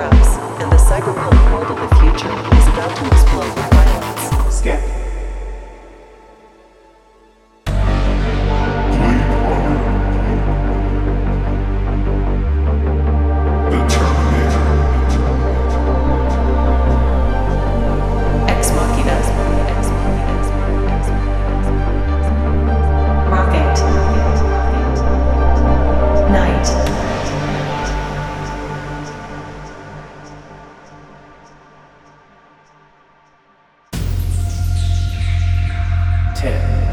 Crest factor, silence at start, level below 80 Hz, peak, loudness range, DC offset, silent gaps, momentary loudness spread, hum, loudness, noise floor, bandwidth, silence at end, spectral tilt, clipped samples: 14 dB; 0 s; -16 dBFS; 0 dBFS; 11 LU; under 0.1%; none; 11 LU; none; -16 LUFS; -52 dBFS; 13.5 kHz; 0 s; -6.5 dB/octave; under 0.1%